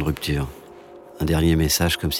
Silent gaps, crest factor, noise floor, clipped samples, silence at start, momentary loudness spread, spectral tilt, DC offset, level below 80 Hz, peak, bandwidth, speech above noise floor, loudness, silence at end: none; 16 dB; -43 dBFS; under 0.1%; 0 s; 10 LU; -4.5 dB/octave; under 0.1%; -32 dBFS; -8 dBFS; 18 kHz; 22 dB; -21 LUFS; 0 s